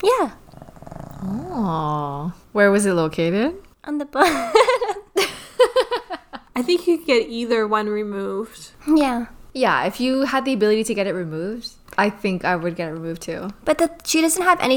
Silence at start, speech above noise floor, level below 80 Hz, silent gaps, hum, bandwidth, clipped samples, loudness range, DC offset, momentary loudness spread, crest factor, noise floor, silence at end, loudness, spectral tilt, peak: 0 s; 21 dB; -50 dBFS; none; none; over 20 kHz; under 0.1%; 3 LU; under 0.1%; 13 LU; 20 dB; -41 dBFS; 0 s; -21 LUFS; -4.5 dB/octave; 0 dBFS